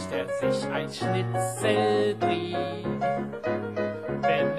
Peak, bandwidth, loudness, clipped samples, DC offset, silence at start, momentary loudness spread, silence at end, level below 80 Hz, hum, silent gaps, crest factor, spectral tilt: -10 dBFS; 13 kHz; -27 LUFS; under 0.1%; 0.1%; 0 s; 6 LU; 0 s; -58 dBFS; none; none; 18 dB; -5.5 dB/octave